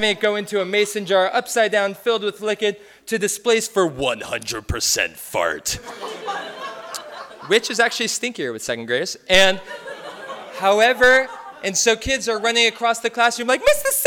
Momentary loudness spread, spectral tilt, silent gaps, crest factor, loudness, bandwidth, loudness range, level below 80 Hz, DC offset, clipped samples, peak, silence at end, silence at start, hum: 17 LU; -2 dB/octave; none; 20 dB; -19 LUFS; over 20 kHz; 6 LU; -46 dBFS; under 0.1%; under 0.1%; -2 dBFS; 0 s; 0 s; none